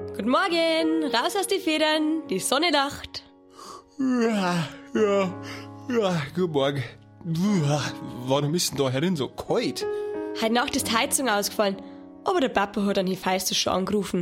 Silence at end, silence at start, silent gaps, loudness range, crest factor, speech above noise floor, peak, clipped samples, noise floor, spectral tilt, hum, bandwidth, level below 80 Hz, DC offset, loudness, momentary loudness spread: 0 s; 0 s; none; 2 LU; 18 dB; 20 dB; -6 dBFS; under 0.1%; -45 dBFS; -4 dB/octave; none; 16.5 kHz; -58 dBFS; under 0.1%; -24 LUFS; 12 LU